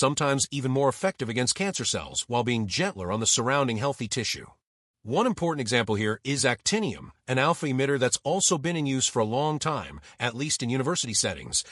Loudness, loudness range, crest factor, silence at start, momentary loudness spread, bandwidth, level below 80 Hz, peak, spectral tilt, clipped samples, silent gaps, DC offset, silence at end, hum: -26 LUFS; 2 LU; 18 dB; 0 s; 6 LU; 13.5 kHz; -60 dBFS; -8 dBFS; -3.5 dB/octave; under 0.1%; 4.67-4.94 s; under 0.1%; 0 s; none